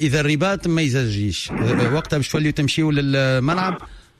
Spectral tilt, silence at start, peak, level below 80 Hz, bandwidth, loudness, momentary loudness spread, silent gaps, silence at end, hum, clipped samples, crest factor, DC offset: -5.5 dB/octave; 0 s; -8 dBFS; -42 dBFS; 13.5 kHz; -20 LUFS; 4 LU; none; 0.2 s; none; under 0.1%; 12 dB; under 0.1%